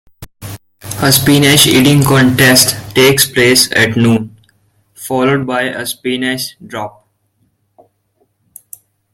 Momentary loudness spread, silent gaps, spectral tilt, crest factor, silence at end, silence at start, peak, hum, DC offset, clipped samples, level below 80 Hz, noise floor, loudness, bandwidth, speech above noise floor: 22 LU; none; -3.5 dB/octave; 12 dB; 2.25 s; 0.2 s; 0 dBFS; none; under 0.1%; 0.1%; -44 dBFS; -61 dBFS; -10 LUFS; over 20 kHz; 50 dB